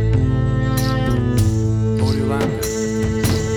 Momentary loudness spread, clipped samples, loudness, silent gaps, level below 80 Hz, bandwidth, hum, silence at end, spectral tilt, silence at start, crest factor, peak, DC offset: 3 LU; under 0.1%; -19 LUFS; none; -28 dBFS; 19 kHz; none; 0 s; -6.5 dB/octave; 0 s; 12 dB; -6 dBFS; under 0.1%